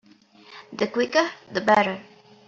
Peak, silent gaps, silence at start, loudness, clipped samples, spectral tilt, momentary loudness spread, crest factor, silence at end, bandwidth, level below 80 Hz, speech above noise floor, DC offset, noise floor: -4 dBFS; none; 0.5 s; -23 LUFS; under 0.1%; -2.5 dB/octave; 13 LU; 22 dB; 0.45 s; 7.8 kHz; -70 dBFS; 30 dB; under 0.1%; -53 dBFS